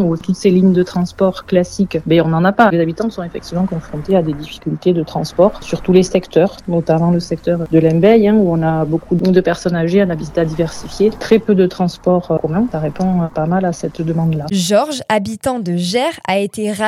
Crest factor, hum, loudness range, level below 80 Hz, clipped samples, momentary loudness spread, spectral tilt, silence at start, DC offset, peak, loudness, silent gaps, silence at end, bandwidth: 14 dB; none; 3 LU; -40 dBFS; under 0.1%; 8 LU; -6.5 dB/octave; 0 s; under 0.1%; 0 dBFS; -15 LUFS; none; 0 s; 13.5 kHz